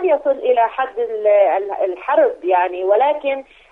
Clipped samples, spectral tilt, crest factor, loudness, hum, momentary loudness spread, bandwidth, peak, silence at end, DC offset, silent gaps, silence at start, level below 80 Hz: under 0.1%; -5 dB/octave; 14 dB; -17 LUFS; none; 7 LU; 3.9 kHz; -2 dBFS; 0.3 s; under 0.1%; none; 0 s; -60 dBFS